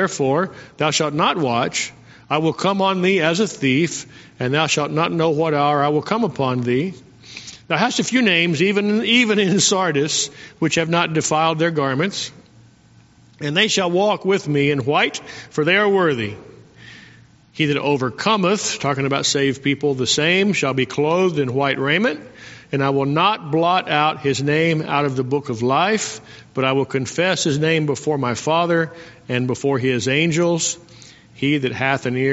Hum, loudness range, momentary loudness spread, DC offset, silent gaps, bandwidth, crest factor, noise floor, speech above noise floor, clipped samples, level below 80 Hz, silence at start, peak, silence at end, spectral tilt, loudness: none; 3 LU; 9 LU; under 0.1%; none; 8.2 kHz; 18 dB; -50 dBFS; 32 dB; under 0.1%; -58 dBFS; 0 s; 0 dBFS; 0 s; -4 dB/octave; -19 LUFS